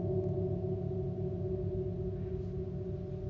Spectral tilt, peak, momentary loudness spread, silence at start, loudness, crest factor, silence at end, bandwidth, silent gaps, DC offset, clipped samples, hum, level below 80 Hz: -12 dB/octave; -22 dBFS; 5 LU; 0 s; -37 LUFS; 14 dB; 0 s; 5.2 kHz; none; under 0.1%; under 0.1%; none; -46 dBFS